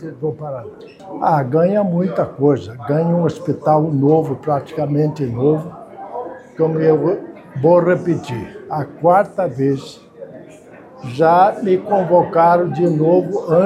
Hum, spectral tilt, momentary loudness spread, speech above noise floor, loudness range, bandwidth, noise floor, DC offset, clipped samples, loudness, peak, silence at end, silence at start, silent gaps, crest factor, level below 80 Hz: none; -9 dB/octave; 17 LU; 24 dB; 3 LU; 11.5 kHz; -40 dBFS; under 0.1%; under 0.1%; -16 LUFS; 0 dBFS; 0 s; 0 s; none; 16 dB; -58 dBFS